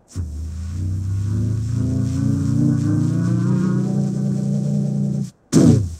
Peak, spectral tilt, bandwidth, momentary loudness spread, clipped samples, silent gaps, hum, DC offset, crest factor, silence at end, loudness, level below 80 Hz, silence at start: 0 dBFS; -8 dB/octave; 12.5 kHz; 9 LU; under 0.1%; none; none; under 0.1%; 18 dB; 0 s; -20 LUFS; -36 dBFS; 0.1 s